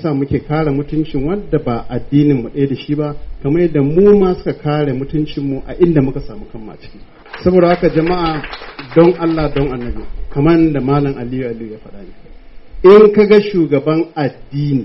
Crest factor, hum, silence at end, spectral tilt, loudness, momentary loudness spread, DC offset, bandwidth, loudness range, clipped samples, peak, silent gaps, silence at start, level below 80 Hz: 14 dB; none; 0 s; -7 dB/octave; -14 LUFS; 16 LU; under 0.1%; 5.8 kHz; 5 LU; under 0.1%; 0 dBFS; none; 0 s; -32 dBFS